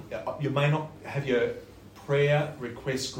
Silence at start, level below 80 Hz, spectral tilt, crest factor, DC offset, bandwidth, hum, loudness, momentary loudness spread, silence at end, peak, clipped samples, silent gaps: 0 s; -58 dBFS; -6 dB/octave; 16 dB; under 0.1%; 16.5 kHz; none; -28 LUFS; 11 LU; 0 s; -12 dBFS; under 0.1%; none